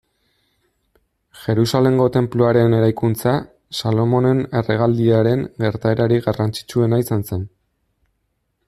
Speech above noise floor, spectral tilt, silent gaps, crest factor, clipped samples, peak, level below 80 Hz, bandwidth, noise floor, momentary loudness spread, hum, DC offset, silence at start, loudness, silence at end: 53 dB; -7.5 dB/octave; none; 16 dB; under 0.1%; -2 dBFS; -52 dBFS; 14.5 kHz; -70 dBFS; 8 LU; none; under 0.1%; 1.35 s; -18 LUFS; 1.2 s